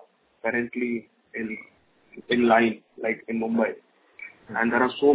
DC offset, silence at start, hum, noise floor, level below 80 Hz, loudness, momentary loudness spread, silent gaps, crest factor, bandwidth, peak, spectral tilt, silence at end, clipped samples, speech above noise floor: under 0.1%; 0.45 s; none; -46 dBFS; -64 dBFS; -25 LUFS; 18 LU; none; 20 dB; 4 kHz; -6 dBFS; -9 dB/octave; 0 s; under 0.1%; 22 dB